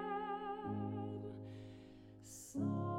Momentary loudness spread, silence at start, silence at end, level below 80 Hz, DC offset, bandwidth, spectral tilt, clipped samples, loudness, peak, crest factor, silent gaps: 15 LU; 0 s; 0 s; -70 dBFS; under 0.1%; 16 kHz; -6.5 dB/octave; under 0.1%; -45 LUFS; -28 dBFS; 14 dB; none